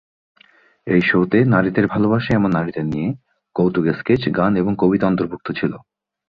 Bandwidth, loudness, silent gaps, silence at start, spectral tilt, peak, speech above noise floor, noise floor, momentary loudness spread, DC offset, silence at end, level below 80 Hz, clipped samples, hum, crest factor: 6.4 kHz; -18 LUFS; none; 0.85 s; -9.5 dB/octave; -2 dBFS; 36 dB; -54 dBFS; 10 LU; under 0.1%; 0.5 s; -48 dBFS; under 0.1%; none; 16 dB